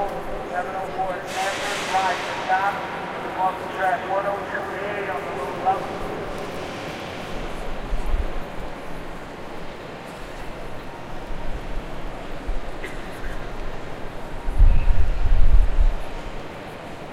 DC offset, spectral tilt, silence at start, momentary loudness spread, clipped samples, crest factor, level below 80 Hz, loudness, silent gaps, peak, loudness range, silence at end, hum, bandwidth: under 0.1%; -5 dB/octave; 0 s; 13 LU; under 0.1%; 20 dB; -24 dBFS; -28 LUFS; none; -2 dBFS; 10 LU; 0 s; none; 11.5 kHz